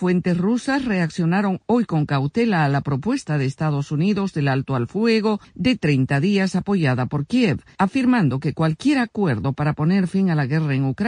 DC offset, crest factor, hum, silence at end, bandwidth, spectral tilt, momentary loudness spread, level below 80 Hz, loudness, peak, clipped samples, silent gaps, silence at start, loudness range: under 0.1%; 14 dB; none; 0 s; 10 kHz; -7.5 dB/octave; 4 LU; -52 dBFS; -21 LUFS; -6 dBFS; under 0.1%; none; 0 s; 1 LU